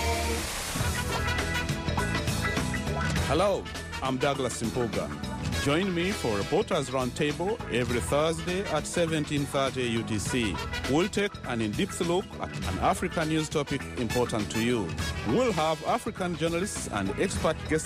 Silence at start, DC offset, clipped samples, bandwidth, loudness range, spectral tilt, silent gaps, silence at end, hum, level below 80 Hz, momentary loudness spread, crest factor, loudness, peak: 0 s; under 0.1%; under 0.1%; 15.5 kHz; 1 LU; -4.5 dB/octave; none; 0 s; none; -42 dBFS; 5 LU; 14 dB; -29 LUFS; -14 dBFS